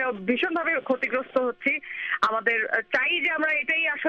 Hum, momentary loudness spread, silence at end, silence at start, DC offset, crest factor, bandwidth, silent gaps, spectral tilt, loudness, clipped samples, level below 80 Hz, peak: none; 4 LU; 0 s; 0 s; under 0.1%; 16 dB; 8.6 kHz; none; -4.5 dB/octave; -24 LUFS; under 0.1%; -68 dBFS; -8 dBFS